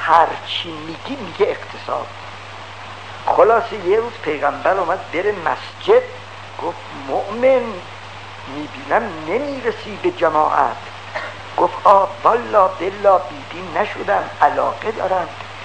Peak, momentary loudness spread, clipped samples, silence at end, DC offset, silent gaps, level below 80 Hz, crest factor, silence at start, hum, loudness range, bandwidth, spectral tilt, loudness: 0 dBFS; 17 LU; under 0.1%; 0 s; 0.6%; none; -56 dBFS; 18 dB; 0 s; none; 5 LU; 9.2 kHz; -5 dB/octave; -18 LUFS